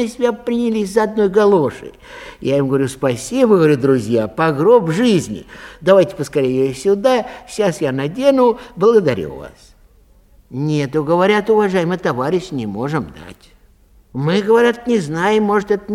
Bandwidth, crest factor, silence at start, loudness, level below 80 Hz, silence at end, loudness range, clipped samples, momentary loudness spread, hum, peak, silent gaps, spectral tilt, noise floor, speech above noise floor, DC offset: 14.5 kHz; 16 dB; 0 s; -16 LUFS; -48 dBFS; 0 s; 4 LU; under 0.1%; 12 LU; none; 0 dBFS; none; -6.5 dB/octave; -49 dBFS; 34 dB; under 0.1%